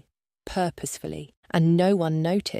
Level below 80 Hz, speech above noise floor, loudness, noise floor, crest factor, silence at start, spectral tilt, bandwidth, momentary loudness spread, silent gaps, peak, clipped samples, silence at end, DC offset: -54 dBFS; 23 dB; -24 LUFS; -46 dBFS; 16 dB; 0.45 s; -6 dB/octave; 15 kHz; 14 LU; 1.37-1.43 s; -8 dBFS; under 0.1%; 0 s; under 0.1%